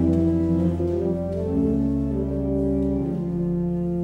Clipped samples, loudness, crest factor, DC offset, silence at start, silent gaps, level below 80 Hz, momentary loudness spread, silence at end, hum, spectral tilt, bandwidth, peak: under 0.1%; -24 LUFS; 14 dB; under 0.1%; 0 s; none; -36 dBFS; 4 LU; 0 s; none; -11 dB/octave; 4.8 kHz; -8 dBFS